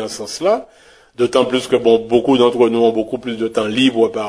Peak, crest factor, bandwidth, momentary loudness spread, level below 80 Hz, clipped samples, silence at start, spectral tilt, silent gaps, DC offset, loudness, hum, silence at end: 0 dBFS; 16 dB; 11 kHz; 8 LU; -54 dBFS; under 0.1%; 0 s; -4.5 dB/octave; none; under 0.1%; -16 LUFS; none; 0 s